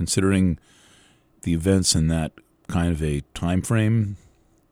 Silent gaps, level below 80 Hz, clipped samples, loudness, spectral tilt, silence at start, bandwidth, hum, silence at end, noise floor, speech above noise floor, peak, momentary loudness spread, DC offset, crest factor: none; -38 dBFS; under 0.1%; -23 LUFS; -5 dB/octave; 0 s; 16 kHz; none; 0.55 s; -57 dBFS; 35 dB; -4 dBFS; 12 LU; under 0.1%; 20 dB